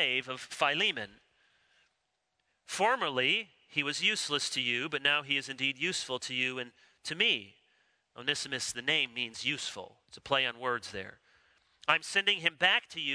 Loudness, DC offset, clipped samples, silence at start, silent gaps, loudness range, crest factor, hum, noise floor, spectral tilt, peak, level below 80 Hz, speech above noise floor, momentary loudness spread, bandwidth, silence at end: -30 LUFS; under 0.1%; under 0.1%; 0 s; none; 4 LU; 24 dB; none; -81 dBFS; -1.5 dB/octave; -8 dBFS; -76 dBFS; 48 dB; 14 LU; 11 kHz; 0 s